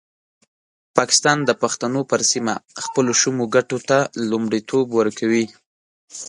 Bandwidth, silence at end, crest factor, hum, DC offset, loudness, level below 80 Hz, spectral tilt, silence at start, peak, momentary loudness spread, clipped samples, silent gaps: 11.5 kHz; 0 s; 20 dB; none; under 0.1%; -19 LUFS; -66 dBFS; -3 dB/octave; 0.95 s; 0 dBFS; 7 LU; under 0.1%; 5.66-6.08 s